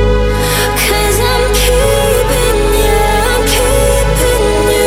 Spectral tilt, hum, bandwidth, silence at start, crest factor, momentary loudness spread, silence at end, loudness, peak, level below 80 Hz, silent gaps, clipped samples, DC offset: -3.5 dB/octave; none; 16.5 kHz; 0 s; 10 dB; 1 LU; 0 s; -11 LUFS; 0 dBFS; -16 dBFS; none; under 0.1%; under 0.1%